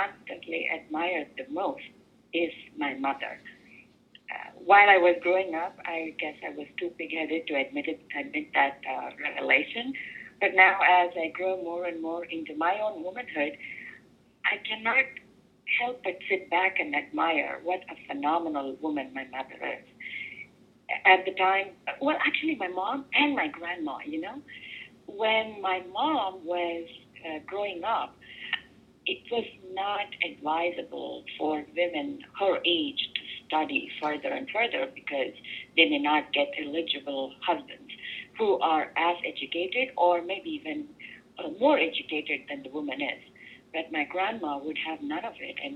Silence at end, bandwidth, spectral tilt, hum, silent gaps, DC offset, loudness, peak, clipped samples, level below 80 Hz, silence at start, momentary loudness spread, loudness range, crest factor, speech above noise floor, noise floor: 0 s; 8.8 kHz; -5 dB/octave; none; none; under 0.1%; -28 LUFS; -6 dBFS; under 0.1%; -74 dBFS; 0 s; 15 LU; 8 LU; 24 dB; 29 dB; -58 dBFS